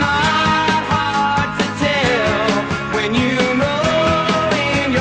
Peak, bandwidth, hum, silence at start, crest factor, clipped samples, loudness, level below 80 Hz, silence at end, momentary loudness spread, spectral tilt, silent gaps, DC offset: -2 dBFS; 9.6 kHz; none; 0 s; 14 dB; under 0.1%; -16 LUFS; -38 dBFS; 0 s; 3 LU; -5 dB/octave; none; under 0.1%